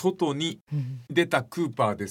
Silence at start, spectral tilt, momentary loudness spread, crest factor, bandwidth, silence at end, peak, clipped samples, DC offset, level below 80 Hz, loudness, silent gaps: 0 s; -5.5 dB/octave; 8 LU; 20 dB; 16.5 kHz; 0 s; -8 dBFS; under 0.1%; under 0.1%; -72 dBFS; -27 LUFS; 0.61-0.67 s